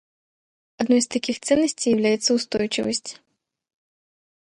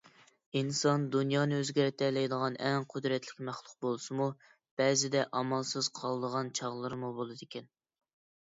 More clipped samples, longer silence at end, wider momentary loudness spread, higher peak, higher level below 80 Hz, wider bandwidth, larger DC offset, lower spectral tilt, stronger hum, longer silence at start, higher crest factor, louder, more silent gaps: neither; first, 1.25 s vs 0.8 s; second, 8 LU vs 12 LU; first, -6 dBFS vs -16 dBFS; first, -62 dBFS vs -78 dBFS; first, 11 kHz vs 7.8 kHz; neither; second, -3 dB/octave vs -4.5 dB/octave; neither; first, 0.8 s vs 0.55 s; about the same, 18 dB vs 18 dB; first, -22 LUFS vs -33 LUFS; second, none vs 4.71-4.77 s